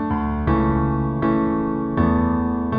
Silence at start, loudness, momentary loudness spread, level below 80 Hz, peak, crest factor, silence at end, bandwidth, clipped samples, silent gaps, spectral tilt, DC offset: 0 s; -20 LUFS; 4 LU; -30 dBFS; -6 dBFS; 14 dB; 0 s; 4.9 kHz; under 0.1%; none; -11.5 dB/octave; under 0.1%